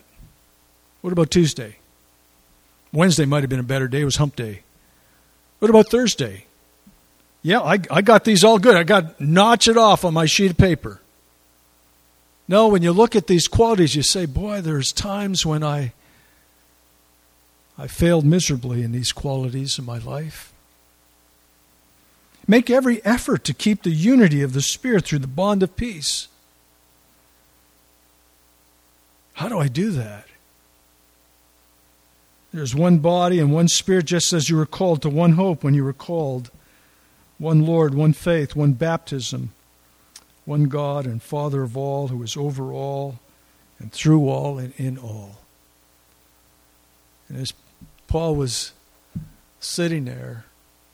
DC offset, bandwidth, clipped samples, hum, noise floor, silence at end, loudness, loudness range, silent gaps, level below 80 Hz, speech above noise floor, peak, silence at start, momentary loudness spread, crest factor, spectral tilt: under 0.1%; 15.5 kHz; under 0.1%; none; -57 dBFS; 0.55 s; -19 LUFS; 13 LU; none; -44 dBFS; 39 dB; 0 dBFS; 1.05 s; 17 LU; 20 dB; -5 dB/octave